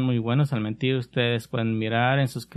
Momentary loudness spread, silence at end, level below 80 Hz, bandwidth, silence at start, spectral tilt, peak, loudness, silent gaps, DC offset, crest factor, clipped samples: 4 LU; 0.1 s; -60 dBFS; 13.5 kHz; 0 s; -7 dB/octave; -8 dBFS; -24 LUFS; none; under 0.1%; 16 dB; under 0.1%